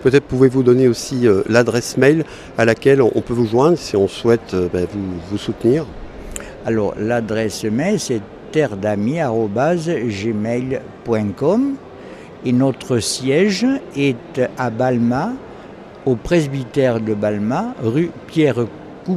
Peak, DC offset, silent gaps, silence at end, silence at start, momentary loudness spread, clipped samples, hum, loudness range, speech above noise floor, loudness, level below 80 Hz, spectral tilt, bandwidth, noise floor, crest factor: 0 dBFS; under 0.1%; none; 0 s; 0 s; 11 LU; under 0.1%; none; 5 LU; 20 dB; -18 LUFS; -44 dBFS; -6 dB/octave; 14.5 kHz; -36 dBFS; 16 dB